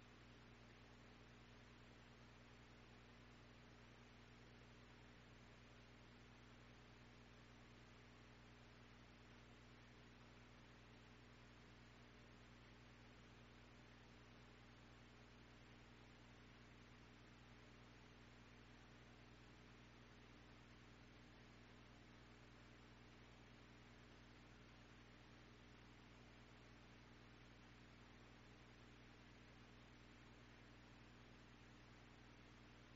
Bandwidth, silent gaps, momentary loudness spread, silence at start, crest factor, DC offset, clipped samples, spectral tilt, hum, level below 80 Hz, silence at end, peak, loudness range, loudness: 7.6 kHz; none; 0 LU; 0 s; 14 dB; under 0.1%; under 0.1%; -4 dB/octave; 60 Hz at -70 dBFS; -72 dBFS; 0 s; -52 dBFS; 0 LU; -66 LUFS